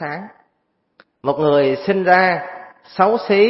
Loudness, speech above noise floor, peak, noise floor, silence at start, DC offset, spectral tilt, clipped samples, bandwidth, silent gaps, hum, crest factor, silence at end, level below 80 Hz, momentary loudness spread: -17 LUFS; 53 dB; 0 dBFS; -68 dBFS; 0 s; under 0.1%; -9 dB/octave; under 0.1%; 5.8 kHz; none; none; 18 dB; 0 s; -60 dBFS; 18 LU